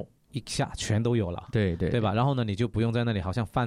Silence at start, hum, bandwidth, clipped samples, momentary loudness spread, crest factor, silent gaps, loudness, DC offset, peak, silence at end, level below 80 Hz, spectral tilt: 0 s; none; 12 kHz; under 0.1%; 5 LU; 14 dB; none; -28 LUFS; under 0.1%; -14 dBFS; 0 s; -50 dBFS; -6.5 dB/octave